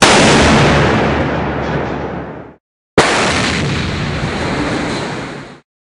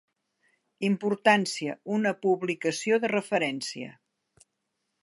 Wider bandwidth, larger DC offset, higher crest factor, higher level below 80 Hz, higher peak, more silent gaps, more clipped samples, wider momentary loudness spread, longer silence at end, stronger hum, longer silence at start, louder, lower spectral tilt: first, 13.5 kHz vs 11.5 kHz; neither; second, 14 dB vs 22 dB; first, -30 dBFS vs -80 dBFS; first, 0 dBFS vs -6 dBFS; first, 2.60-2.97 s vs none; neither; first, 16 LU vs 11 LU; second, 0.35 s vs 1.1 s; neither; second, 0 s vs 0.8 s; first, -13 LUFS vs -27 LUFS; about the same, -4.5 dB/octave vs -4.5 dB/octave